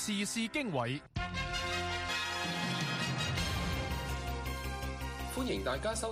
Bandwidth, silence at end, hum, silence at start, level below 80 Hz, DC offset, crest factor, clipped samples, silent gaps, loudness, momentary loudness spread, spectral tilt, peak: 15.5 kHz; 0 s; none; 0 s; -46 dBFS; under 0.1%; 16 dB; under 0.1%; none; -35 LUFS; 5 LU; -4 dB/octave; -20 dBFS